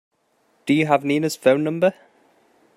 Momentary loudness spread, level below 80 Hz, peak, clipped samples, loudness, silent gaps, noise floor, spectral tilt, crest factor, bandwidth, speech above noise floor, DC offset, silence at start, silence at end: 4 LU; -68 dBFS; -2 dBFS; under 0.1%; -20 LUFS; none; -64 dBFS; -6 dB/octave; 20 dB; 15.5 kHz; 45 dB; under 0.1%; 0.65 s; 0.85 s